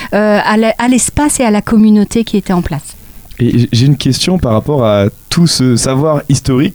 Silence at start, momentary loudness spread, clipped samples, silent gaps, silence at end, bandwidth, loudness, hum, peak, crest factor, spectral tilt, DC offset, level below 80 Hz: 0 s; 5 LU; under 0.1%; none; 0 s; over 20 kHz; -11 LUFS; none; 0 dBFS; 10 dB; -5.5 dB/octave; under 0.1%; -32 dBFS